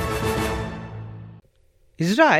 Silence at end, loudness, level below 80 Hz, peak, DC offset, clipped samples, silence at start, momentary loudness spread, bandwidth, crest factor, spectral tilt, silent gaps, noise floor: 0 s; -25 LUFS; -40 dBFS; -4 dBFS; under 0.1%; under 0.1%; 0 s; 18 LU; 16 kHz; 20 dB; -5 dB/octave; none; -58 dBFS